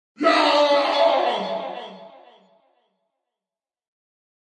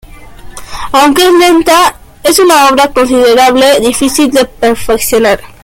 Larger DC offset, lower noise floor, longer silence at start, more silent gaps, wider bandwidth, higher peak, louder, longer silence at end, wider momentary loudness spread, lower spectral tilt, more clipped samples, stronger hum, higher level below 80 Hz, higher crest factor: neither; first, under -90 dBFS vs -28 dBFS; about the same, 0.2 s vs 0.2 s; neither; second, 10 kHz vs 17 kHz; second, -4 dBFS vs 0 dBFS; second, -19 LUFS vs -7 LUFS; first, 2.35 s vs 0.15 s; first, 17 LU vs 6 LU; about the same, -3 dB/octave vs -2.5 dB/octave; second, under 0.1% vs 0.3%; neither; second, -88 dBFS vs -32 dBFS; first, 18 dB vs 8 dB